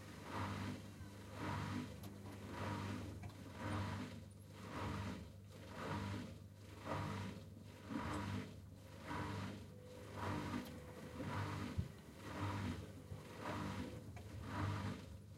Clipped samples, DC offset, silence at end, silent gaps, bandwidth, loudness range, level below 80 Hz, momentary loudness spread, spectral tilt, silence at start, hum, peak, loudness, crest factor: under 0.1%; under 0.1%; 0 s; none; 16 kHz; 1 LU; -62 dBFS; 10 LU; -6 dB/octave; 0 s; none; -28 dBFS; -48 LUFS; 18 dB